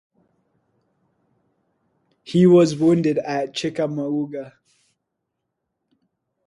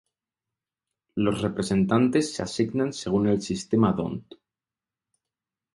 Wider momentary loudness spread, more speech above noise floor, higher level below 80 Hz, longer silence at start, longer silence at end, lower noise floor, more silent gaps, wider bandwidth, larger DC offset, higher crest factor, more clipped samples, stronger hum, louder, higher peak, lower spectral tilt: first, 15 LU vs 8 LU; second, 60 dB vs over 66 dB; second, -66 dBFS vs -54 dBFS; first, 2.25 s vs 1.15 s; first, 1.95 s vs 1.55 s; second, -79 dBFS vs under -90 dBFS; neither; about the same, 11 kHz vs 11.5 kHz; neither; about the same, 18 dB vs 20 dB; neither; neither; first, -19 LUFS vs -25 LUFS; about the same, -4 dBFS vs -6 dBFS; about the same, -7 dB/octave vs -6 dB/octave